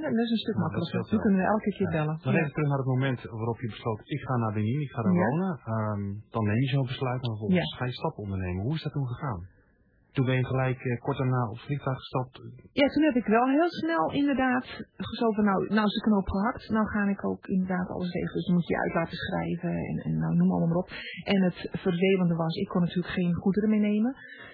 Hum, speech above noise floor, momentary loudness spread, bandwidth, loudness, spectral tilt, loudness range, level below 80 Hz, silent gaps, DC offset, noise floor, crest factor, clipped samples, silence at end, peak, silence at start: none; 37 dB; 8 LU; 5.2 kHz; -28 LUFS; -10 dB/octave; 4 LU; -54 dBFS; none; under 0.1%; -64 dBFS; 16 dB; under 0.1%; 0 s; -12 dBFS; 0 s